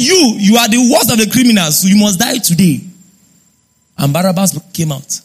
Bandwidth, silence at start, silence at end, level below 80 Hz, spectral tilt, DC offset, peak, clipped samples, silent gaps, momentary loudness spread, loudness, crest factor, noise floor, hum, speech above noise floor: 16 kHz; 0 s; 0.05 s; -48 dBFS; -4 dB/octave; under 0.1%; 0 dBFS; under 0.1%; none; 9 LU; -10 LUFS; 12 dB; -55 dBFS; none; 44 dB